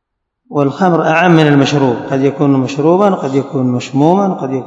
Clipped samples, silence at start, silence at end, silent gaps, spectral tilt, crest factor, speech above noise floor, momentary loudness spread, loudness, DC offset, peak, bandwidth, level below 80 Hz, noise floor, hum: 0.5%; 0.5 s; 0 s; none; -7 dB/octave; 12 dB; 50 dB; 7 LU; -12 LUFS; under 0.1%; 0 dBFS; 7.8 kHz; -58 dBFS; -61 dBFS; none